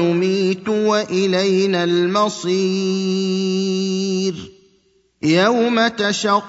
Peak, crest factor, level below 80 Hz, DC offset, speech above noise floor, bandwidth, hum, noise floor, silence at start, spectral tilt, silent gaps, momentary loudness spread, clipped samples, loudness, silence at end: -2 dBFS; 16 dB; -62 dBFS; under 0.1%; 42 dB; 8 kHz; none; -59 dBFS; 0 s; -5 dB/octave; none; 4 LU; under 0.1%; -18 LUFS; 0 s